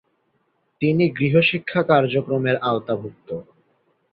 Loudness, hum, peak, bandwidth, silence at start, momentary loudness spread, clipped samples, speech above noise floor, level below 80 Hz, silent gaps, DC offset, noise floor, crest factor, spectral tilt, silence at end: -20 LUFS; none; -2 dBFS; 5.2 kHz; 0.8 s; 15 LU; under 0.1%; 48 dB; -60 dBFS; none; under 0.1%; -68 dBFS; 20 dB; -10 dB/octave; 0.7 s